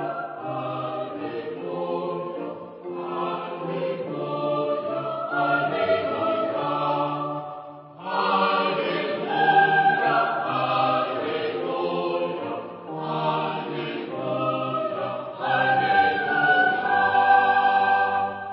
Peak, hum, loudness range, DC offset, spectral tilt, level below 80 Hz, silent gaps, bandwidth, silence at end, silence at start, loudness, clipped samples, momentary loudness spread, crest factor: -6 dBFS; none; 9 LU; under 0.1%; -9.5 dB/octave; -68 dBFS; none; 5.6 kHz; 0 s; 0 s; -24 LUFS; under 0.1%; 13 LU; 18 dB